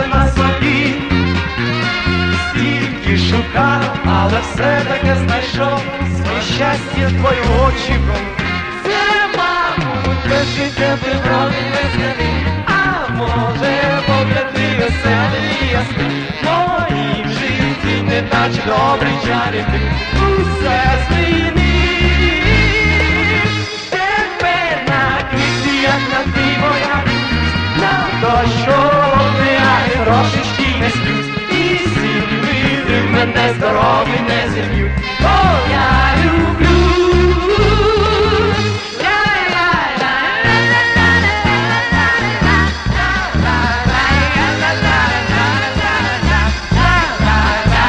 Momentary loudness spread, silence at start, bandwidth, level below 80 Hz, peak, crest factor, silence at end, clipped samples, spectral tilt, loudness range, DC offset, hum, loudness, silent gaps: 5 LU; 0 s; 9.6 kHz; -24 dBFS; 0 dBFS; 14 dB; 0 s; under 0.1%; -5.5 dB/octave; 3 LU; under 0.1%; none; -14 LUFS; none